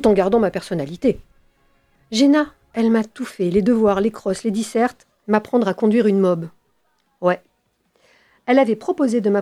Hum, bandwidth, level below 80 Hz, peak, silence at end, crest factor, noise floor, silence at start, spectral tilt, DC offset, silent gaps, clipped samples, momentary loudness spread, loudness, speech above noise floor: none; 13 kHz; -50 dBFS; -4 dBFS; 0 s; 16 dB; -66 dBFS; 0 s; -6 dB/octave; under 0.1%; none; under 0.1%; 10 LU; -19 LUFS; 48 dB